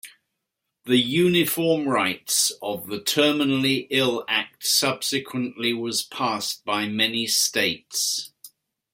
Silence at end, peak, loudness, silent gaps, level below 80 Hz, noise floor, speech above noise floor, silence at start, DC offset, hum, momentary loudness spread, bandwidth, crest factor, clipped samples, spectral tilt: 0.45 s; -4 dBFS; -22 LUFS; none; -68 dBFS; -81 dBFS; 58 dB; 0.05 s; under 0.1%; none; 7 LU; 16.5 kHz; 20 dB; under 0.1%; -2.5 dB/octave